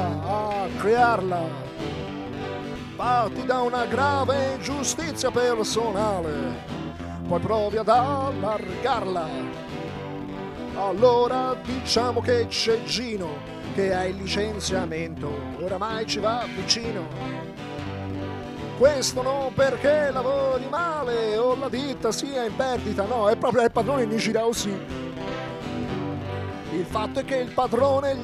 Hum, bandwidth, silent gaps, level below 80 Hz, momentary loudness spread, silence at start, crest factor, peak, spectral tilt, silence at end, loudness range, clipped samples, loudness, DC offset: none; 14 kHz; none; -48 dBFS; 12 LU; 0 s; 20 dB; -6 dBFS; -4.5 dB/octave; 0 s; 4 LU; under 0.1%; -25 LUFS; under 0.1%